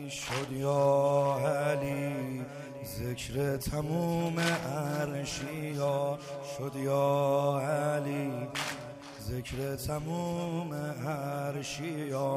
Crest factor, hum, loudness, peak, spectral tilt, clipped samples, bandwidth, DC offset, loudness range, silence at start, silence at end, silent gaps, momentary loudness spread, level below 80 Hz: 16 dB; none; -32 LUFS; -14 dBFS; -5.5 dB/octave; under 0.1%; 15.5 kHz; under 0.1%; 5 LU; 0 s; 0 s; none; 11 LU; -56 dBFS